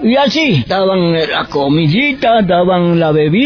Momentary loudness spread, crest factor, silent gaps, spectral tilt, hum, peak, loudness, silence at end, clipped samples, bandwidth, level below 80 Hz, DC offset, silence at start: 3 LU; 8 dB; none; -7 dB/octave; none; -2 dBFS; -12 LUFS; 0 s; under 0.1%; 5.4 kHz; -42 dBFS; under 0.1%; 0 s